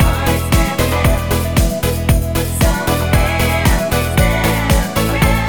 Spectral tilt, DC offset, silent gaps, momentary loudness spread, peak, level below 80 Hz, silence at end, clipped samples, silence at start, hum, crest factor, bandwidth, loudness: -5 dB/octave; 0.9%; none; 3 LU; 0 dBFS; -18 dBFS; 0 s; under 0.1%; 0 s; none; 14 dB; 19.5 kHz; -15 LUFS